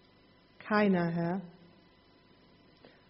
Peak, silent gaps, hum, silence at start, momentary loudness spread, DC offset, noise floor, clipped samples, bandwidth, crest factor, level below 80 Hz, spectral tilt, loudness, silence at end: -14 dBFS; none; 50 Hz at -75 dBFS; 0.65 s; 22 LU; under 0.1%; -63 dBFS; under 0.1%; 5.8 kHz; 20 dB; -72 dBFS; -6 dB/octave; -31 LUFS; 1.6 s